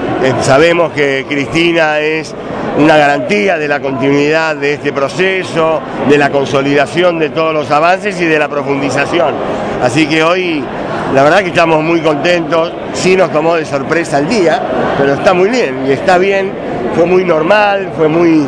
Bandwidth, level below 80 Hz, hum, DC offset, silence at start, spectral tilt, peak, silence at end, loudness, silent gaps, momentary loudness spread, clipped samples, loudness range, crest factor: 11 kHz; -42 dBFS; none; under 0.1%; 0 s; -5.5 dB/octave; 0 dBFS; 0 s; -11 LUFS; none; 6 LU; 0.7%; 1 LU; 10 dB